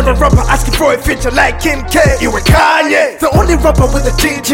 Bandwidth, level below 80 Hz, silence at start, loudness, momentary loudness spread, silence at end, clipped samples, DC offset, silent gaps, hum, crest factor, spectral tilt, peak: 17 kHz; -16 dBFS; 0 s; -10 LUFS; 4 LU; 0 s; under 0.1%; under 0.1%; none; none; 10 dB; -4.5 dB/octave; 0 dBFS